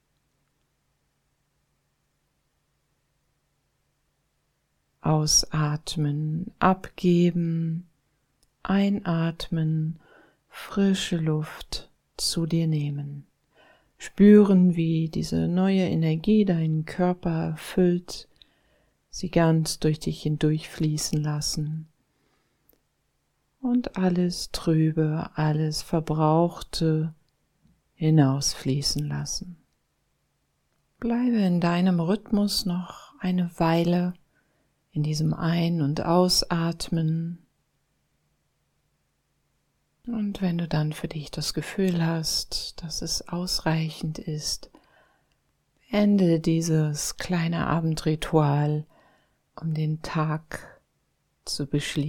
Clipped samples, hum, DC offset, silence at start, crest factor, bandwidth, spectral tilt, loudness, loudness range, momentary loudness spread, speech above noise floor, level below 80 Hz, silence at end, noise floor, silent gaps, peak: under 0.1%; none; under 0.1%; 5.05 s; 20 dB; 16.5 kHz; -5.5 dB/octave; -25 LUFS; 8 LU; 12 LU; 49 dB; -48 dBFS; 0 s; -73 dBFS; none; -6 dBFS